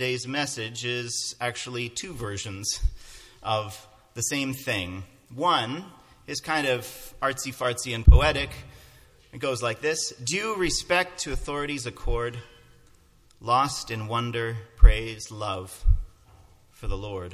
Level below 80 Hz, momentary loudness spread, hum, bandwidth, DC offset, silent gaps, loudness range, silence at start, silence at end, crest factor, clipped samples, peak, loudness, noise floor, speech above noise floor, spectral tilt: -28 dBFS; 16 LU; none; 15 kHz; under 0.1%; none; 5 LU; 0 s; 0 s; 26 dB; under 0.1%; 0 dBFS; -27 LUFS; -57 dBFS; 31 dB; -4 dB/octave